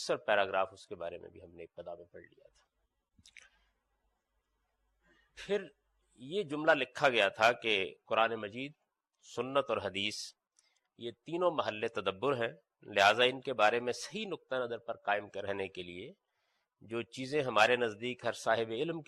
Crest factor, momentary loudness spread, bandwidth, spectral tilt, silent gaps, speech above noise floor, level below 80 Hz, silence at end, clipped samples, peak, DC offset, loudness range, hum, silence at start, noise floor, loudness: 22 dB; 18 LU; 13 kHz; -3.5 dB/octave; none; 48 dB; -78 dBFS; 0.05 s; under 0.1%; -12 dBFS; under 0.1%; 14 LU; none; 0 s; -81 dBFS; -33 LUFS